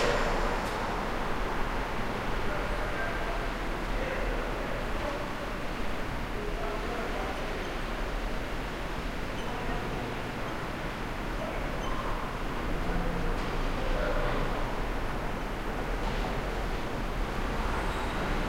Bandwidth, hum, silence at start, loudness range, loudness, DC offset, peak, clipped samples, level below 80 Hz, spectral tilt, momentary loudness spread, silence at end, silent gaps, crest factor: 16 kHz; none; 0 s; 2 LU; -34 LUFS; 0.2%; -16 dBFS; under 0.1%; -34 dBFS; -5.5 dB/octave; 4 LU; 0 s; none; 16 dB